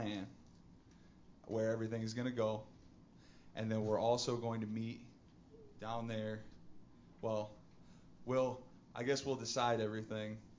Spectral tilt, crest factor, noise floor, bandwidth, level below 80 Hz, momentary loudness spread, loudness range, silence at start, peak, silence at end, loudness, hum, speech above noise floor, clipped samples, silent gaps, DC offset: -5.5 dB/octave; 20 dB; -63 dBFS; 7.6 kHz; -70 dBFS; 18 LU; 6 LU; 0 s; -22 dBFS; 0.05 s; -40 LUFS; none; 24 dB; under 0.1%; none; under 0.1%